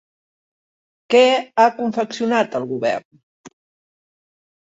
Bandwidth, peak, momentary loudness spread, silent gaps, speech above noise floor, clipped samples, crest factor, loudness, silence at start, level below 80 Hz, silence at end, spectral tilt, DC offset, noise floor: 8 kHz; -2 dBFS; 9 LU; 3.05-3.11 s, 3.23-3.44 s; over 72 dB; under 0.1%; 18 dB; -18 LUFS; 1.1 s; -68 dBFS; 1.2 s; -4 dB/octave; under 0.1%; under -90 dBFS